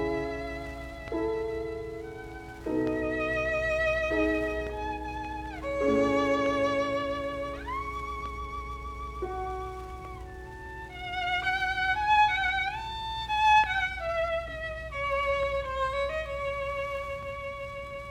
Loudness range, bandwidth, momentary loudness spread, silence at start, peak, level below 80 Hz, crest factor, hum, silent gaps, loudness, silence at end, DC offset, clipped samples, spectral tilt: 9 LU; 16 kHz; 14 LU; 0 s; -12 dBFS; -44 dBFS; 18 dB; none; none; -30 LUFS; 0 s; under 0.1%; under 0.1%; -5 dB/octave